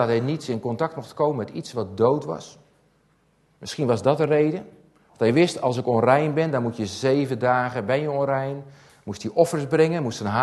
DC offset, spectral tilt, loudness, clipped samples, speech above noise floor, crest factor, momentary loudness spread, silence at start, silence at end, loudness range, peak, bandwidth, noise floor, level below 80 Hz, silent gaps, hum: under 0.1%; -6.5 dB/octave; -23 LUFS; under 0.1%; 41 dB; 20 dB; 12 LU; 0 s; 0 s; 5 LU; -4 dBFS; 12.5 kHz; -63 dBFS; -64 dBFS; none; none